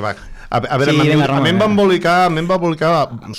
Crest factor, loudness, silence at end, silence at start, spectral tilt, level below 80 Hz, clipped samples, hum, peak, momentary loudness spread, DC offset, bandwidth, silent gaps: 12 dB; -14 LUFS; 0 s; 0 s; -6.5 dB/octave; -42 dBFS; under 0.1%; none; -2 dBFS; 8 LU; under 0.1%; 15 kHz; none